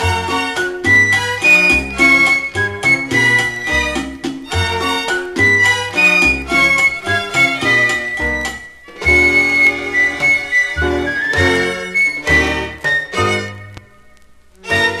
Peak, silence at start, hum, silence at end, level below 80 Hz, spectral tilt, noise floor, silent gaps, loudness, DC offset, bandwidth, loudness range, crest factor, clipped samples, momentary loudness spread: -2 dBFS; 0 s; none; 0 s; -34 dBFS; -3.5 dB/octave; -44 dBFS; none; -13 LUFS; under 0.1%; 15.5 kHz; 4 LU; 14 dB; under 0.1%; 9 LU